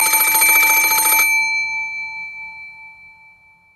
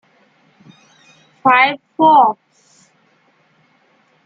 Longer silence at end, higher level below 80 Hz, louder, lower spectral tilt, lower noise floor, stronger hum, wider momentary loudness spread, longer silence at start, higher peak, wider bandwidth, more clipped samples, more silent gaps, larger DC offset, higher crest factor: second, 0.85 s vs 1.95 s; first, -62 dBFS vs -70 dBFS; about the same, -13 LUFS vs -13 LUFS; second, 2 dB/octave vs -5.5 dB/octave; second, -49 dBFS vs -57 dBFS; neither; first, 21 LU vs 8 LU; second, 0 s vs 1.45 s; about the same, 0 dBFS vs -2 dBFS; first, 15.5 kHz vs 7.6 kHz; neither; neither; neither; about the same, 18 dB vs 18 dB